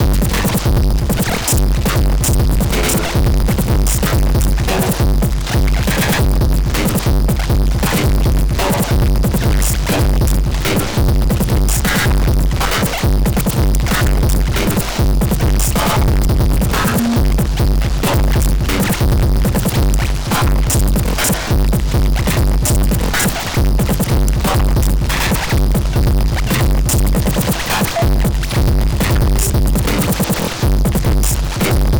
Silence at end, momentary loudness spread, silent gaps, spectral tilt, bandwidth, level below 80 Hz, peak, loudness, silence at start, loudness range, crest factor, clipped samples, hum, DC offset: 0 s; 2 LU; none; -5 dB/octave; over 20 kHz; -16 dBFS; -10 dBFS; -15 LUFS; 0 s; 0 LU; 2 dB; under 0.1%; none; under 0.1%